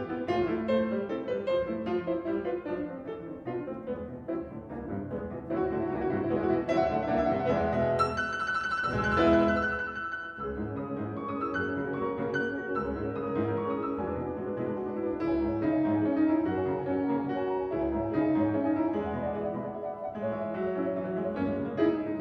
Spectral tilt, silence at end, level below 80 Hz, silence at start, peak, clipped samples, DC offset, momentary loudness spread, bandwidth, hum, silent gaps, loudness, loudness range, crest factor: -7.5 dB/octave; 0 s; -52 dBFS; 0 s; -12 dBFS; under 0.1%; under 0.1%; 9 LU; 9 kHz; none; none; -30 LUFS; 6 LU; 18 dB